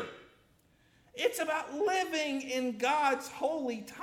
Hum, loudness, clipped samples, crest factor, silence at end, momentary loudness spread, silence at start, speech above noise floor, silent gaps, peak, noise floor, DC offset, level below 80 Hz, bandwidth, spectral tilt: none; -32 LUFS; under 0.1%; 18 dB; 0 s; 7 LU; 0 s; 34 dB; none; -16 dBFS; -67 dBFS; under 0.1%; -74 dBFS; 17.5 kHz; -2.5 dB/octave